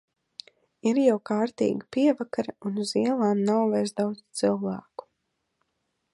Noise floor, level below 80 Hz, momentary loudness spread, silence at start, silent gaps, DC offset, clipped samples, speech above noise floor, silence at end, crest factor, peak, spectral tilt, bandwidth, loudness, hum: -78 dBFS; -72 dBFS; 21 LU; 0.85 s; none; under 0.1%; under 0.1%; 53 dB; 1.35 s; 18 dB; -8 dBFS; -6 dB/octave; 11.5 kHz; -26 LUFS; none